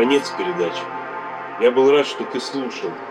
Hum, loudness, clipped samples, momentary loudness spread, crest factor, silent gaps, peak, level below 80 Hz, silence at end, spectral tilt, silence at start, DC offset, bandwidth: none; -21 LUFS; under 0.1%; 14 LU; 16 dB; none; -4 dBFS; -74 dBFS; 0 s; -4 dB/octave; 0 s; under 0.1%; 10.5 kHz